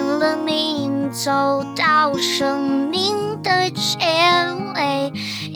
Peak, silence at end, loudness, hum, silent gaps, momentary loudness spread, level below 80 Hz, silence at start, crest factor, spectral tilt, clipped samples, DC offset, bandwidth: -4 dBFS; 0 s; -18 LUFS; none; none; 7 LU; -68 dBFS; 0 s; 16 dB; -3.5 dB/octave; under 0.1%; under 0.1%; over 20 kHz